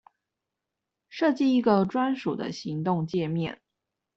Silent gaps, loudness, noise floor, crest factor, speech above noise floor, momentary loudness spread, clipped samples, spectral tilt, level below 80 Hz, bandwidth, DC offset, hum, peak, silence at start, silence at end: none; -26 LUFS; -86 dBFS; 18 dB; 60 dB; 10 LU; under 0.1%; -7.5 dB/octave; -68 dBFS; 7.6 kHz; under 0.1%; none; -10 dBFS; 1.1 s; 0.6 s